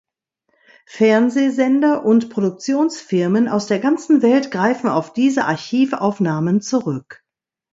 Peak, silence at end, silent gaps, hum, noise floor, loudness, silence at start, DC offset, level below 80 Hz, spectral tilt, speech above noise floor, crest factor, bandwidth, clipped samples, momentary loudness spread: -2 dBFS; 0.6 s; none; none; -83 dBFS; -17 LUFS; 0.9 s; under 0.1%; -66 dBFS; -6 dB/octave; 67 dB; 16 dB; 7.8 kHz; under 0.1%; 6 LU